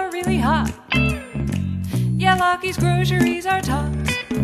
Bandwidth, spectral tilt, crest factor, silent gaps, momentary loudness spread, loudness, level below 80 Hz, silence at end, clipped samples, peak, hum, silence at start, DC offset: 14.5 kHz; -5.5 dB/octave; 16 dB; none; 6 LU; -20 LUFS; -34 dBFS; 0 s; under 0.1%; -4 dBFS; none; 0 s; under 0.1%